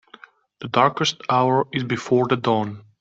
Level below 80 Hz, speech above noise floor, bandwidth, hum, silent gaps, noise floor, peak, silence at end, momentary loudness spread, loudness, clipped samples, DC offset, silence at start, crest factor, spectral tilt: -62 dBFS; 28 dB; 8 kHz; none; none; -48 dBFS; -2 dBFS; 0.2 s; 6 LU; -21 LUFS; under 0.1%; under 0.1%; 0.6 s; 20 dB; -5.5 dB/octave